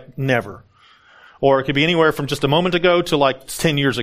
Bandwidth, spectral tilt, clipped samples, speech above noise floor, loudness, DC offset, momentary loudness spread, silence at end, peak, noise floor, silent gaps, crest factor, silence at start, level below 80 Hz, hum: 15.5 kHz; -5 dB/octave; under 0.1%; 33 dB; -17 LUFS; under 0.1%; 5 LU; 0 s; -2 dBFS; -50 dBFS; none; 18 dB; 0 s; -46 dBFS; none